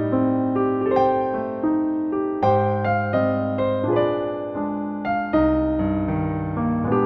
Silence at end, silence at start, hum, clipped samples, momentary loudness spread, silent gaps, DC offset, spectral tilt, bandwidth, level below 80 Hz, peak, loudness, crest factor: 0 s; 0 s; none; under 0.1%; 6 LU; none; under 0.1%; -10 dB/octave; 5.4 kHz; -42 dBFS; -6 dBFS; -22 LUFS; 14 dB